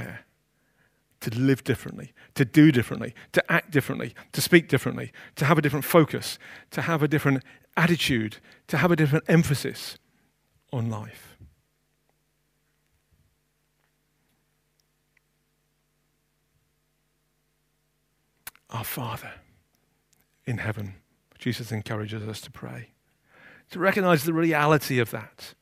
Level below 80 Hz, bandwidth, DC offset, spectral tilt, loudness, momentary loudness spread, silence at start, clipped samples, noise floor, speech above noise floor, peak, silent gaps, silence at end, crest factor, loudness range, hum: -60 dBFS; 15.5 kHz; under 0.1%; -6 dB/octave; -24 LUFS; 19 LU; 0 s; under 0.1%; -72 dBFS; 48 dB; 0 dBFS; none; 0.1 s; 26 dB; 16 LU; none